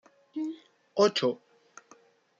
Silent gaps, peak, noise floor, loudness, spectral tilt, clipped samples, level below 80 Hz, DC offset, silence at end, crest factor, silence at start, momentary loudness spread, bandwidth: none; -12 dBFS; -60 dBFS; -29 LUFS; -4.5 dB/octave; under 0.1%; -84 dBFS; under 0.1%; 1.05 s; 20 dB; 0.35 s; 18 LU; 7.8 kHz